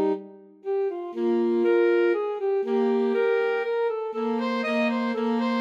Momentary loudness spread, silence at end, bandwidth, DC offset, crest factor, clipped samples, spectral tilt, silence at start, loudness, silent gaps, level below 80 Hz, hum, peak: 7 LU; 0 s; 7.4 kHz; under 0.1%; 12 dB; under 0.1%; -6.5 dB/octave; 0 s; -25 LUFS; none; under -90 dBFS; none; -12 dBFS